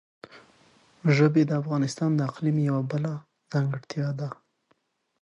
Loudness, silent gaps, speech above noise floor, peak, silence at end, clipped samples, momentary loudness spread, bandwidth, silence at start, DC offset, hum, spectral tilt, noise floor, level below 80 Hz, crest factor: -26 LUFS; none; 46 dB; -8 dBFS; 0.9 s; under 0.1%; 12 LU; 10.5 kHz; 0.35 s; under 0.1%; none; -7.5 dB/octave; -71 dBFS; -72 dBFS; 18 dB